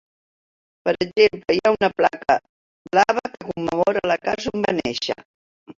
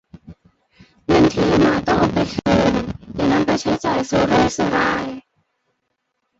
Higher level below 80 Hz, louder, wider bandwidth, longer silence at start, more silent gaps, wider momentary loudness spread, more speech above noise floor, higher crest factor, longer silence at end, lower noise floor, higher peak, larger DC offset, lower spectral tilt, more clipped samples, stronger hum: second, -56 dBFS vs -40 dBFS; second, -21 LUFS vs -18 LUFS; about the same, 7.6 kHz vs 8 kHz; first, 0.85 s vs 0.3 s; first, 2.49-2.85 s, 5.25-5.66 s vs none; about the same, 9 LU vs 9 LU; first, over 70 dB vs 56 dB; about the same, 20 dB vs 16 dB; second, 0.05 s vs 1.2 s; first, under -90 dBFS vs -73 dBFS; about the same, -2 dBFS vs -2 dBFS; neither; about the same, -4.5 dB/octave vs -5.5 dB/octave; neither; neither